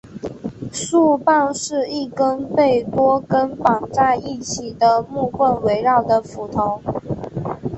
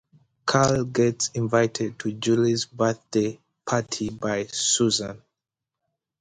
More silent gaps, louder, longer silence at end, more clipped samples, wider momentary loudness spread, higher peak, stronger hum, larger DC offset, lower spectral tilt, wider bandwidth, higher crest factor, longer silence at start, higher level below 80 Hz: neither; first, -19 LUFS vs -24 LUFS; second, 0 s vs 1.05 s; neither; about the same, 11 LU vs 9 LU; first, -2 dBFS vs -6 dBFS; neither; neither; about the same, -5 dB/octave vs -4 dB/octave; second, 8.6 kHz vs 9.6 kHz; about the same, 18 dB vs 20 dB; second, 0.05 s vs 0.45 s; first, -48 dBFS vs -58 dBFS